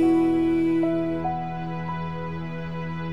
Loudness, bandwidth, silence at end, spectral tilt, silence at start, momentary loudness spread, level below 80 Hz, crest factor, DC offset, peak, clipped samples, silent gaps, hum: -26 LUFS; 5.8 kHz; 0 s; -9 dB/octave; 0 s; 11 LU; -50 dBFS; 12 dB; 0.9%; -12 dBFS; under 0.1%; none; none